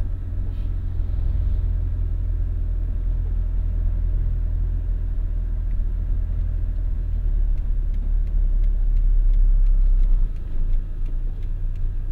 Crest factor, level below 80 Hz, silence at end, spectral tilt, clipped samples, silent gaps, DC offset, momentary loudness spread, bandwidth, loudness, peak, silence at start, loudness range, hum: 12 dB; -20 dBFS; 0 s; -10 dB/octave; under 0.1%; none; under 0.1%; 7 LU; 1.8 kHz; -27 LUFS; -8 dBFS; 0 s; 3 LU; none